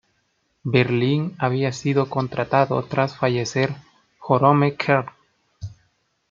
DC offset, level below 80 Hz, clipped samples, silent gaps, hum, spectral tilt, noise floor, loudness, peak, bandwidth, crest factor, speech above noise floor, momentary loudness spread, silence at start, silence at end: under 0.1%; -58 dBFS; under 0.1%; none; none; -6.5 dB/octave; -69 dBFS; -21 LUFS; -2 dBFS; 7.6 kHz; 20 dB; 49 dB; 20 LU; 0.65 s; 0.55 s